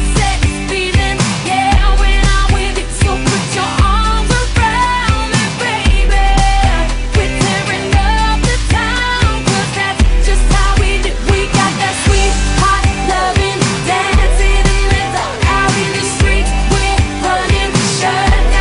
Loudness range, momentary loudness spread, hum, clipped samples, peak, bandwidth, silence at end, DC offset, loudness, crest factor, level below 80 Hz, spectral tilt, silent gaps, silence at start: 1 LU; 3 LU; none; under 0.1%; 0 dBFS; 11 kHz; 0 s; under 0.1%; -13 LUFS; 12 dB; -14 dBFS; -4 dB/octave; none; 0 s